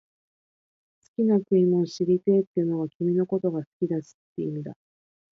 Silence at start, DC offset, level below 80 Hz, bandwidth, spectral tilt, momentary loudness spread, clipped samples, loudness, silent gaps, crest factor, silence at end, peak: 1.2 s; under 0.1%; -72 dBFS; 7.2 kHz; -9 dB/octave; 13 LU; under 0.1%; -25 LUFS; 2.47-2.54 s, 2.95-3.00 s, 3.67-3.80 s, 4.14-4.36 s; 16 dB; 0.65 s; -10 dBFS